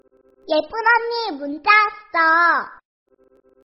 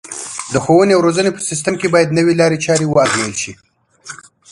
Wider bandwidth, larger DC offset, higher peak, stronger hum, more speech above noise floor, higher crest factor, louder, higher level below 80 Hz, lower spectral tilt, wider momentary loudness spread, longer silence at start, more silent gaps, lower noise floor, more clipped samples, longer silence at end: second, 6 kHz vs 11.5 kHz; neither; about the same, -2 dBFS vs 0 dBFS; neither; first, 38 dB vs 23 dB; about the same, 18 dB vs 14 dB; second, -17 LUFS vs -14 LUFS; second, -64 dBFS vs -50 dBFS; second, 2 dB/octave vs -4.5 dB/octave; second, 10 LU vs 16 LU; first, 0.5 s vs 0.05 s; neither; first, -57 dBFS vs -37 dBFS; neither; first, 0.95 s vs 0.35 s